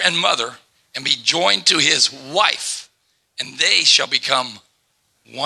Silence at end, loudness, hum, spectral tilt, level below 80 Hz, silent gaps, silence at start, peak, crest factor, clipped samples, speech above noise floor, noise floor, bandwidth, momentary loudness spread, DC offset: 0 s; -16 LUFS; none; -0.5 dB/octave; -72 dBFS; none; 0 s; 0 dBFS; 20 dB; under 0.1%; 47 dB; -65 dBFS; 13.5 kHz; 16 LU; under 0.1%